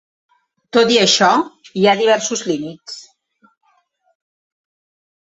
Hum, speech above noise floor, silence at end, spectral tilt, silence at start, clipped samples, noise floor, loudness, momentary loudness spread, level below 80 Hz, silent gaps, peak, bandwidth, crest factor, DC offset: none; 46 dB; 2.2 s; -3 dB/octave; 0.75 s; under 0.1%; -61 dBFS; -15 LUFS; 19 LU; -64 dBFS; none; 0 dBFS; 8 kHz; 18 dB; under 0.1%